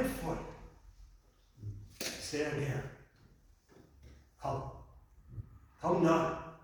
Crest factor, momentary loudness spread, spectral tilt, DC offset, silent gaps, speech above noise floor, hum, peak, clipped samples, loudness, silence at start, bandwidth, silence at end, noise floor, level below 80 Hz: 20 dB; 24 LU; -5.5 dB/octave; under 0.1%; none; 31 dB; none; -18 dBFS; under 0.1%; -36 LUFS; 0 s; over 20 kHz; 0 s; -64 dBFS; -56 dBFS